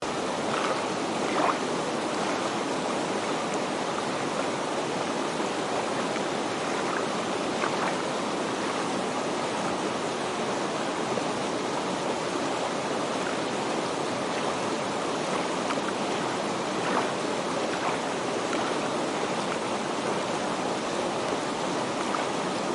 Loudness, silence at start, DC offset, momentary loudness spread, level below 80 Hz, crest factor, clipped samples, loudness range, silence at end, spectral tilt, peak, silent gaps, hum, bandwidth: -28 LUFS; 0 s; under 0.1%; 2 LU; -66 dBFS; 16 dB; under 0.1%; 1 LU; 0 s; -3.5 dB/octave; -12 dBFS; none; none; 11.5 kHz